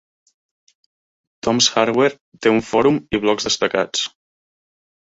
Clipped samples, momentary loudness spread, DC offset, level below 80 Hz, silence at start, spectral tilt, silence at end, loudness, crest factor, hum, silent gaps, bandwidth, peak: under 0.1%; 7 LU; under 0.1%; -52 dBFS; 1.45 s; -3 dB/octave; 1 s; -18 LUFS; 20 dB; none; 2.21-2.32 s; 8 kHz; 0 dBFS